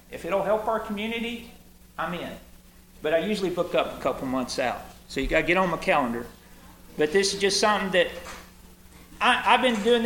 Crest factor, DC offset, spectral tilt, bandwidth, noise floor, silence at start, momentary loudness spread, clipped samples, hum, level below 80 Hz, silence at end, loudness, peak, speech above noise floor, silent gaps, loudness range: 22 dB; under 0.1%; -3.5 dB/octave; 17.5 kHz; -51 dBFS; 0.1 s; 17 LU; under 0.1%; none; -48 dBFS; 0 s; -25 LUFS; -4 dBFS; 26 dB; none; 6 LU